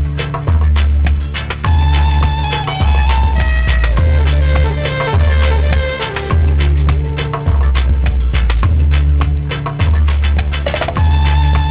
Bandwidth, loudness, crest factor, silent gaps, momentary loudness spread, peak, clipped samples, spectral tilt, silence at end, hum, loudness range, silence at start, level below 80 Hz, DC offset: 4 kHz; -14 LUFS; 12 dB; none; 5 LU; 0 dBFS; under 0.1%; -10.5 dB/octave; 0 s; none; 1 LU; 0 s; -12 dBFS; 0.4%